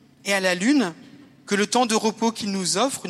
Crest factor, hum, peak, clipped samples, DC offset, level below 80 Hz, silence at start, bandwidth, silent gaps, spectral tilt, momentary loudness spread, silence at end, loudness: 18 dB; none; -6 dBFS; under 0.1%; under 0.1%; -72 dBFS; 0.25 s; 14.5 kHz; none; -3 dB/octave; 5 LU; 0 s; -22 LUFS